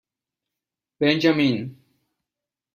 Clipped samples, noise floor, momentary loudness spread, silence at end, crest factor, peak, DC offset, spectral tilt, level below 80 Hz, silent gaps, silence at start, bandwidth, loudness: under 0.1%; -88 dBFS; 12 LU; 1.05 s; 20 dB; -4 dBFS; under 0.1%; -6.5 dB/octave; -66 dBFS; none; 1 s; 14.5 kHz; -21 LUFS